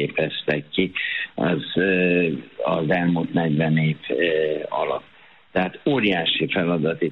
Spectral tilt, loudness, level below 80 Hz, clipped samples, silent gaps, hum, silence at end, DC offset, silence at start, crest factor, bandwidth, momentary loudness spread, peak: -9 dB/octave; -22 LUFS; -58 dBFS; under 0.1%; none; none; 0 s; 0.1%; 0 s; 16 dB; 5 kHz; 6 LU; -6 dBFS